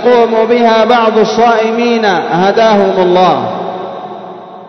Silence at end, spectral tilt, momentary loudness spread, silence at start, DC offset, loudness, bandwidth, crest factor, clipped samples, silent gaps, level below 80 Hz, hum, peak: 0 s; -5.5 dB/octave; 15 LU; 0 s; under 0.1%; -9 LUFS; 6.4 kHz; 10 dB; 0.3%; none; -54 dBFS; none; 0 dBFS